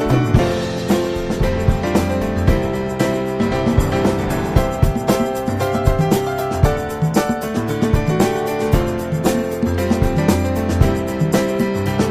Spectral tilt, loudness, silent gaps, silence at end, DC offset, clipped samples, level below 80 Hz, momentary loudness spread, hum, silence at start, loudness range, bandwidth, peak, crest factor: -6.5 dB/octave; -18 LUFS; none; 0 s; under 0.1%; under 0.1%; -26 dBFS; 4 LU; none; 0 s; 1 LU; 15.5 kHz; 0 dBFS; 16 dB